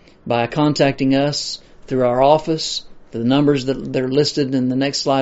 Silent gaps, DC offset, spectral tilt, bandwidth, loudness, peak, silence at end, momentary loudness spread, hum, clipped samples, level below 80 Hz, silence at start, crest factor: none; under 0.1%; -5 dB/octave; 8 kHz; -18 LUFS; 0 dBFS; 0 s; 9 LU; none; under 0.1%; -46 dBFS; 0.25 s; 18 dB